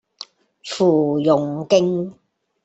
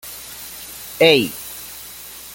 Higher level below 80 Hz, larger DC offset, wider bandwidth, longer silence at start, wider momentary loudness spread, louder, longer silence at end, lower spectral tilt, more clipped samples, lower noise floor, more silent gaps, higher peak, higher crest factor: second, -62 dBFS vs -54 dBFS; neither; second, 8.2 kHz vs 17 kHz; first, 0.2 s vs 0.05 s; about the same, 21 LU vs 19 LU; second, -18 LUFS vs -15 LUFS; first, 0.5 s vs 0.05 s; first, -6.5 dB/octave vs -3 dB/octave; neither; first, -42 dBFS vs -37 dBFS; neither; about the same, -2 dBFS vs 0 dBFS; about the same, 16 dB vs 20 dB